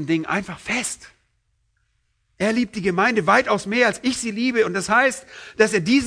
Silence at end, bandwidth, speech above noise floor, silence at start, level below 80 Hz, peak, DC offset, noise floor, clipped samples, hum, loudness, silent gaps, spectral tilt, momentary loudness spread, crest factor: 0 s; 11 kHz; 48 dB; 0 s; -56 dBFS; -2 dBFS; under 0.1%; -68 dBFS; under 0.1%; none; -20 LUFS; none; -4 dB/octave; 8 LU; 20 dB